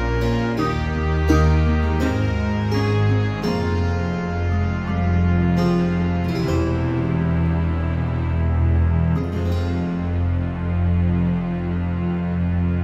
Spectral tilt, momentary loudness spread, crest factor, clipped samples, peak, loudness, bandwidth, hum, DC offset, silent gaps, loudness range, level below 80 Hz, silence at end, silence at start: -8 dB/octave; 5 LU; 14 dB; under 0.1%; -4 dBFS; -21 LUFS; 7.8 kHz; none; under 0.1%; none; 2 LU; -28 dBFS; 0 s; 0 s